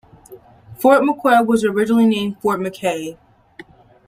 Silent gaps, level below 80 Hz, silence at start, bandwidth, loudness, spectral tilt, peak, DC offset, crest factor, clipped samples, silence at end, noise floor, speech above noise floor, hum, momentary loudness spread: none; -58 dBFS; 0.3 s; 16 kHz; -17 LUFS; -5.5 dB/octave; -2 dBFS; under 0.1%; 18 dB; under 0.1%; 0.45 s; -44 dBFS; 27 dB; none; 9 LU